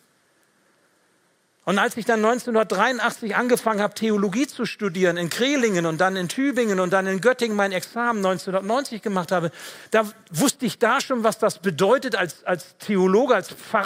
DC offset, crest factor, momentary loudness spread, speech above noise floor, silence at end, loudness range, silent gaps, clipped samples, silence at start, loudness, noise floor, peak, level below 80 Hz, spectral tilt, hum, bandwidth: under 0.1%; 20 dB; 6 LU; 42 dB; 0 s; 2 LU; none; under 0.1%; 1.65 s; -22 LUFS; -64 dBFS; -2 dBFS; -72 dBFS; -4.5 dB/octave; none; 16 kHz